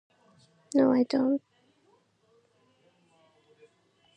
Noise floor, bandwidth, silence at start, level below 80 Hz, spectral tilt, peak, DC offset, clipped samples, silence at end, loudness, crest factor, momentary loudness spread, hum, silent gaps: -67 dBFS; 8.8 kHz; 0.75 s; -82 dBFS; -6 dB/octave; -12 dBFS; under 0.1%; under 0.1%; 2.8 s; -26 LUFS; 20 dB; 7 LU; none; none